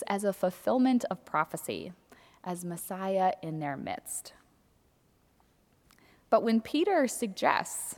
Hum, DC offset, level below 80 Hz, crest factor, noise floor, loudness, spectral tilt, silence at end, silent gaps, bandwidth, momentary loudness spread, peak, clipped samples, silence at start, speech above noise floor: none; under 0.1%; -72 dBFS; 22 dB; -67 dBFS; -30 LUFS; -4.5 dB/octave; 0 s; none; 18.5 kHz; 12 LU; -8 dBFS; under 0.1%; 0 s; 37 dB